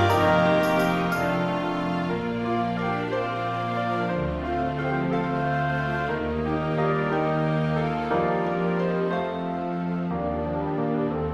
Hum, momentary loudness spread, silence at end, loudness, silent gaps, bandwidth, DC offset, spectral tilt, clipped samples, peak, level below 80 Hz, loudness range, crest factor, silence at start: none; 6 LU; 0 s; -25 LUFS; none; 14.5 kHz; under 0.1%; -7.5 dB/octave; under 0.1%; -8 dBFS; -46 dBFS; 2 LU; 16 dB; 0 s